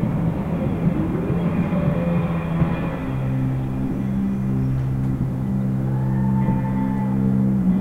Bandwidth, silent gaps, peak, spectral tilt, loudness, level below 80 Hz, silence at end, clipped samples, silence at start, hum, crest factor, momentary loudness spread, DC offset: 4.3 kHz; none; -8 dBFS; -10 dB/octave; -22 LUFS; -36 dBFS; 0 s; under 0.1%; 0 s; none; 14 dB; 4 LU; under 0.1%